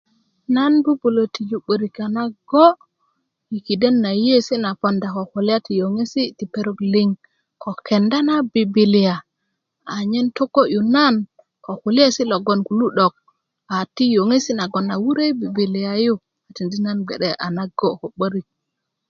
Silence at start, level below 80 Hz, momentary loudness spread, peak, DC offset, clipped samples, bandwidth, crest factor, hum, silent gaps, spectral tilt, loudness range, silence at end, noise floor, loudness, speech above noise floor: 0.5 s; -64 dBFS; 11 LU; 0 dBFS; under 0.1%; under 0.1%; 7.4 kHz; 18 dB; none; none; -6 dB/octave; 3 LU; 0.7 s; -78 dBFS; -19 LUFS; 60 dB